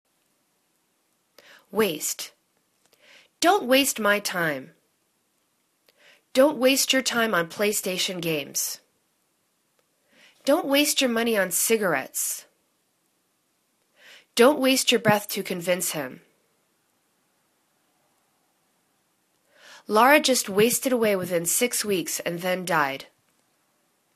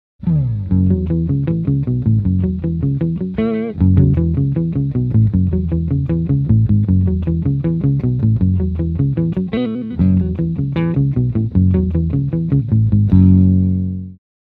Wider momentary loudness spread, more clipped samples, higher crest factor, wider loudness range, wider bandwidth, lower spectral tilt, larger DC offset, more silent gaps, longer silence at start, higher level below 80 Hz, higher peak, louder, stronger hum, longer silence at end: first, 10 LU vs 6 LU; neither; first, 24 dB vs 14 dB; first, 6 LU vs 3 LU; first, 14 kHz vs 4.2 kHz; second, -2.5 dB/octave vs -12.5 dB/octave; neither; neither; first, 1.75 s vs 0.2 s; second, -72 dBFS vs -30 dBFS; about the same, -2 dBFS vs 0 dBFS; second, -23 LUFS vs -16 LUFS; neither; first, 1.1 s vs 0.35 s